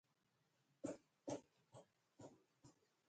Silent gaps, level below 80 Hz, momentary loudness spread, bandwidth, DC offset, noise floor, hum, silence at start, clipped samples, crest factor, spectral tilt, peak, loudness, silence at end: none; -88 dBFS; 15 LU; 9 kHz; under 0.1%; -85 dBFS; none; 0.85 s; under 0.1%; 24 dB; -5.5 dB/octave; -34 dBFS; -55 LUFS; 0.35 s